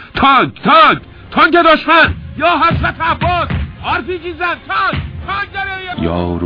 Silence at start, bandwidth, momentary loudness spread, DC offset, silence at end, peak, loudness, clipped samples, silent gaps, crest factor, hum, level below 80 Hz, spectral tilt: 0 s; 5.2 kHz; 12 LU; under 0.1%; 0 s; 0 dBFS; -13 LUFS; under 0.1%; none; 14 dB; none; -32 dBFS; -7.5 dB/octave